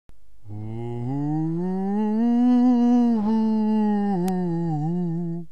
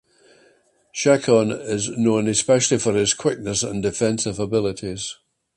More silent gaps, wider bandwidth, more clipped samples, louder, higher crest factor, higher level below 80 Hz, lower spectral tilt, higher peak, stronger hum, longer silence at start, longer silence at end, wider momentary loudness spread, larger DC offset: neither; second, 8.6 kHz vs 11.5 kHz; neither; about the same, -22 LUFS vs -20 LUFS; second, 10 dB vs 18 dB; about the same, -54 dBFS vs -52 dBFS; first, -9.5 dB/octave vs -4 dB/octave; second, -12 dBFS vs -2 dBFS; neither; second, 0.45 s vs 0.95 s; second, 0.05 s vs 0.45 s; first, 13 LU vs 10 LU; first, 2% vs under 0.1%